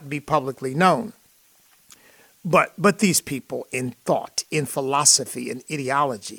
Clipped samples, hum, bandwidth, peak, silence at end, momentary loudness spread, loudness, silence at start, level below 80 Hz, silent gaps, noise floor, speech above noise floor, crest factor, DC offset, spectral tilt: under 0.1%; none; 19 kHz; -4 dBFS; 0 s; 13 LU; -21 LUFS; 0 s; -62 dBFS; none; -58 dBFS; 35 dB; 20 dB; under 0.1%; -3 dB/octave